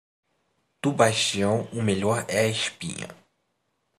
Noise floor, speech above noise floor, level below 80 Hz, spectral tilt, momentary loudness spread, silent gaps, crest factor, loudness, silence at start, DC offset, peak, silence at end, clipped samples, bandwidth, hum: -75 dBFS; 50 dB; -66 dBFS; -4 dB/octave; 13 LU; none; 24 dB; -24 LUFS; 0.85 s; under 0.1%; -4 dBFS; 0.85 s; under 0.1%; 15 kHz; none